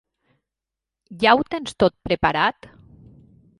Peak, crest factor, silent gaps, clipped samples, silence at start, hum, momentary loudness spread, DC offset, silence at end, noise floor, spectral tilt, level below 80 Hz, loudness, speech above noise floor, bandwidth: -2 dBFS; 22 dB; none; under 0.1%; 1.1 s; none; 5 LU; under 0.1%; 1.1 s; -87 dBFS; -5 dB/octave; -48 dBFS; -20 LUFS; 67 dB; 11.5 kHz